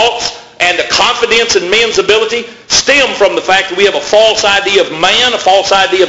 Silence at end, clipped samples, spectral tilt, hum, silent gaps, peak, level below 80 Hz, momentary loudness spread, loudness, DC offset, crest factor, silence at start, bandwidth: 0 s; 0.3%; -1 dB/octave; none; none; 0 dBFS; -42 dBFS; 4 LU; -9 LUFS; under 0.1%; 10 dB; 0 s; 11 kHz